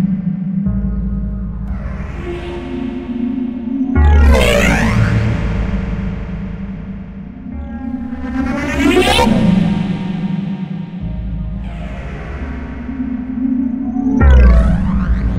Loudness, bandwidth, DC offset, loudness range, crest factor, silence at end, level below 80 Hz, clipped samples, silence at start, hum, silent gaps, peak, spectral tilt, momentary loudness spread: -16 LUFS; 14.5 kHz; 0.7%; 8 LU; 14 dB; 0 s; -18 dBFS; under 0.1%; 0 s; none; none; 0 dBFS; -6.5 dB/octave; 15 LU